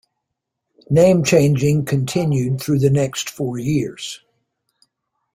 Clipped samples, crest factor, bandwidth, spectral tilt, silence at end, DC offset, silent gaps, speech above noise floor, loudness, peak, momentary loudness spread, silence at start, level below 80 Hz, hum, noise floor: under 0.1%; 18 dB; 16 kHz; -6 dB/octave; 1.2 s; under 0.1%; none; 62 dB; -18 LUFS; -2 dBFS; 12 LU; 0.9 s; -52 dBFS; none; -79 dBFS